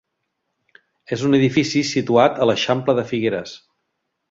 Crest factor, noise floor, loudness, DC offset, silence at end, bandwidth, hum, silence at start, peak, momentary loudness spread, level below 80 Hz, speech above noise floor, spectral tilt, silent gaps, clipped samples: 18 dB; -75 dBFS; -19 LUFS; under 0.1%; 0.75 s; 7.8 kHz; none; 1.1 s; -2 dBFS; 9 LU; -58 dBFS; 57 dB; -5.5 dB/octave; none; under 0.1%